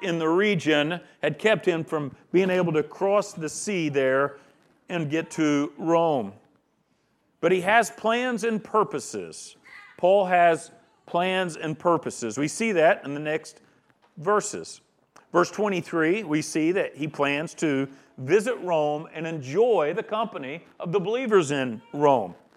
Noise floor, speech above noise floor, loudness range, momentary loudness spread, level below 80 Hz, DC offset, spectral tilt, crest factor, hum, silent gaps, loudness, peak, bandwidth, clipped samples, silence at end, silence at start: -69 dBFS; 45 dB; 2 LU; 11 LU; -76 dBFS; under 0.1%; -5 dB/octave; 20 dB; none; none; -25 LUFS; -6 dBFS; 14 kHz; under 0.1%; 0.25 s; 0 s